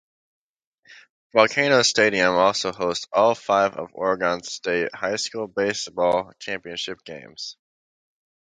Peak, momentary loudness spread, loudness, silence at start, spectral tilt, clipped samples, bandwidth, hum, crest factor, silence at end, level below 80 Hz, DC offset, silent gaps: -2 dBFS; 14 LU; -22 LUFS; 0.9 s; -3 dB/octave; under 0.1%; 9.6 kHz; none; 22 dB; 0.95 s; -62 dBFS; under 0.1%; 1.10-1.30 s